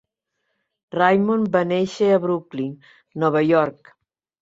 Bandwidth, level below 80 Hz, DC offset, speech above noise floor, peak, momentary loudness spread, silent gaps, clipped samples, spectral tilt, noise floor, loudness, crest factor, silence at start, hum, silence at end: 8 kHz; -64 dBFS; under 0.1%; 57 dB; -2 dBFS; 12 LU; none; under 0.1%; -7 dB/octave; -76 dBFS; -20 LUFS; 18 dB; 0.95 s; none; 0.7 s